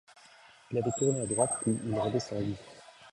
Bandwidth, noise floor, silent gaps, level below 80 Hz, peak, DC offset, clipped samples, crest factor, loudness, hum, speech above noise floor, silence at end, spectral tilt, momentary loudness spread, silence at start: 11 kHz; -57 dBFS; none; -62 dBFS; -12 dBFS; under 0.1%; under 0.1%; 20 dB; -31 LUFS; none; 26 dB; 0.05 s; -5.5 dB/octave; 13 LU; 0.7 s